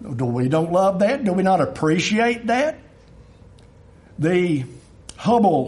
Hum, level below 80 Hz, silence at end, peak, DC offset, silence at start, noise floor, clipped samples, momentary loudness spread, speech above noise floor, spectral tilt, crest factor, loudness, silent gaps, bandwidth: none; -52 dBFS; 0 s; -4 dBFS; under 0.1%; 0 s; -47 dBFS; under 0.1%; 8 LU; 29 dB; -6 dB/octave; 16 dB; -20 LUFS; none; 11.5 kHz